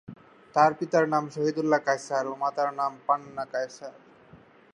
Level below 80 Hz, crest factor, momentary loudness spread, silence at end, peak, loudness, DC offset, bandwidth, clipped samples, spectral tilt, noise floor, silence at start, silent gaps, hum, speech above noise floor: -74 dBFS; 20 dB; 10 LU; 0.4 s; -6 dBFS; -27 LUFS; under 0.1%; 11 kHz; under 0.1%; -5.5 dB/octave; -54 dBFS; 0.1 s; none; none; 28 dB